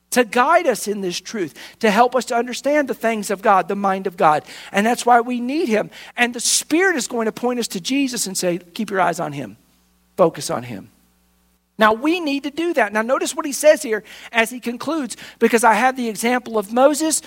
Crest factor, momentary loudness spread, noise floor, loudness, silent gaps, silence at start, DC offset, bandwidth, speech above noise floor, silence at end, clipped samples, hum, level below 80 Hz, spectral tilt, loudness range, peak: 18 dB; 10 LU; -61 dBFS; -19 LUFS; none; 0.1 s; under 0.1%; 16.5 kHz; 42 dB; 0 s; under 0.1%; none; -64 dBFS; -3 dB/octave; 4 LU; 0 dBFS